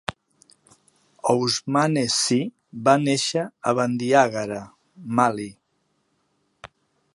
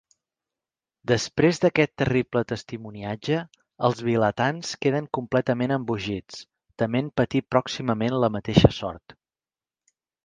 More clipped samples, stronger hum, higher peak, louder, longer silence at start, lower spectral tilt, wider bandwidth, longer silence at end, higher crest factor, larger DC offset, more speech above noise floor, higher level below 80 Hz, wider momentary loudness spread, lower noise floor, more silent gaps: neither; neither; about the same, -2 dBFS vs 0 dBFS; about the same, -22 LUFS vs -24 LUFS; second, 0.1 s vs 1.1 s; second, -4 dB/octave vs -6 dB/octave; first, 11.5 kHz vs 9.6 kHz; second, 0.5 s vs 1.25 s; about the same, 22 dB vs 24 dB; neither; second, 49 dB vs over 66 dB; second, -62 dBFS vs -46 dBFS; about the same, 14 LU vs 13 LU; second, -71 dBFS vs under -90 dBFS; neither